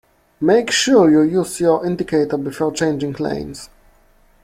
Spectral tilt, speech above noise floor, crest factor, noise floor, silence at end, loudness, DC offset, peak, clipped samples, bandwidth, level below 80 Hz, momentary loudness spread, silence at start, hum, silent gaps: -4.5 dB/octave; 37 dB; 16 dB; -53 dBFS; 0.8 s; -17 LUFS; under 0.1%; -2 dBFS; under 0.1%; 15.5 kHz; -50 dBFS; 12 LU; 0.4 s; none; none